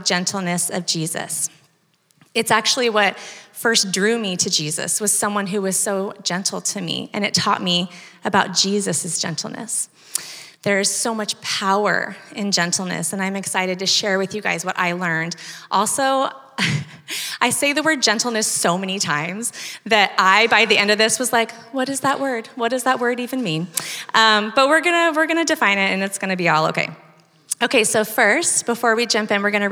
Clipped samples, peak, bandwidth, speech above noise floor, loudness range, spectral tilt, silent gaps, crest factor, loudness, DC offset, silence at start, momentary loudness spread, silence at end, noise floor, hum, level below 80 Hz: under 0.1%; 0 dBFS; over 20 kHz; 42 dB; 4 LU; -2.5 dB/octave; none; 20 dB; -19 LUFS; under 0.1%; 0 s; 10 LU; 0 s; -62 dBFS; none; -76 dBFS